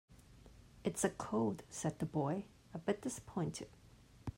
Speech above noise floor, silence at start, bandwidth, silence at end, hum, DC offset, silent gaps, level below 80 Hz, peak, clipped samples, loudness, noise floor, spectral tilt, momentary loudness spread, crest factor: 21 dB; 0.1 s; 16 kHz; 0.05 s; none; under 0.1%; none; -64 dBFS; -18 dBFS; under 0.1%; -41 LUFS; -60 dBFS; -5.5 dB/octave; 11 LU; 24 dB